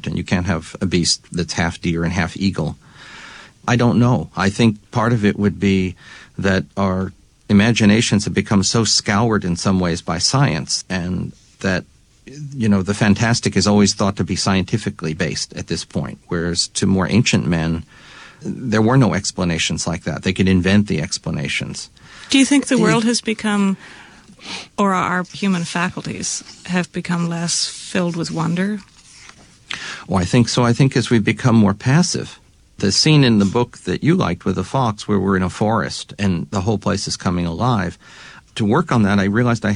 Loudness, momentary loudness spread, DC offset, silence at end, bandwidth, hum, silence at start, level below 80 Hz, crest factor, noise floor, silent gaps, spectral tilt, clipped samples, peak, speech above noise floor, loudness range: -18 LUFS; 11 LU; under 0.1%; 0 s; 11 kHz; none; 0.05 s; -44 dBFS; 16 dB; -44 dBFS; none; -5 dB/octave; under 0.1%; -2 dBFS; 27 dB; 5 LU